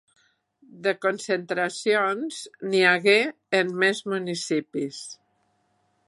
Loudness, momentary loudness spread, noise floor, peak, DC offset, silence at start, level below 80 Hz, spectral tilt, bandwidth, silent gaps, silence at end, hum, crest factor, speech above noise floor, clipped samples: -24 LUFS; 13 LU; -69 dBFS; -4 dBFS; under 0.1%; 0.75 s; -80 dBFS; -3.5 dB/octave; 11.5 kHz; none; 0.95 s; none; 22 dB; 45 dB; under 0.1%